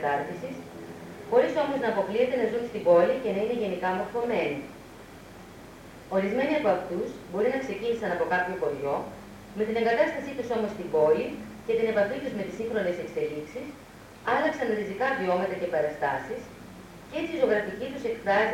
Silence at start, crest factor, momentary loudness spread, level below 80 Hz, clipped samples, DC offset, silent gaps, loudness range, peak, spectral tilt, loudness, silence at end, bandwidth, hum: 0 s; 18 dB; 19 LU; -60 dBFS; under 0.1%; under 0.1%; none; 4 LU; -10 dBFS; -6 dB/octave; -28 LUFS; 0 s; 16.5 kHz; none